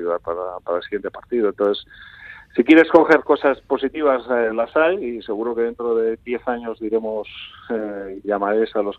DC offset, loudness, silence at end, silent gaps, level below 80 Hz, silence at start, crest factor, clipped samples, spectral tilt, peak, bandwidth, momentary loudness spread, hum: under 0.1%; -20 LUFS; 0 s; none; -56 dBFS; 0 s; 20 dB; under 0.1%; -6.5 dB/octave; 0 dBFS; 6.6 kHz; 14 LU; none